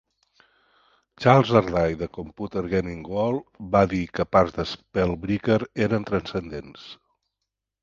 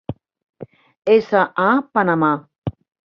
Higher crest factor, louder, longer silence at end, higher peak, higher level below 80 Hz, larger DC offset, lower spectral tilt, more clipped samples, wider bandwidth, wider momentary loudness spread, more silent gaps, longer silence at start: first, 24 dB vs 18 dB; second, -24 LUFS vs -17 LUFS; first, 0.9 s vs 0.35 s; about the same, 0 dBFS vs -2 dBFS; first, -46 dBFS vs -52 dBFS; neither; about the same, -7.5 dB/octave vs -8.5 dB/octave; neither; first, 7.4 kHz vs 6.2 kHz; about the same, 15 LU vs 16 LU; second, none vs 0.43-0.53 s, 2.58-2.62 s; first, 1.2 s vs 0.1 s